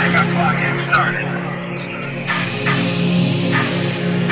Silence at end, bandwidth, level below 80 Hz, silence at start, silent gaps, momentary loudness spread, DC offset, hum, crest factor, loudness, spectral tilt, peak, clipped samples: 0 s; 4 kHz; -50 dBFS; 0 s; none; 9 LU; under 0.1%; none; 16 dB; -18 LUFS; -10 dB/octave; -2 dBFS; under 0.1%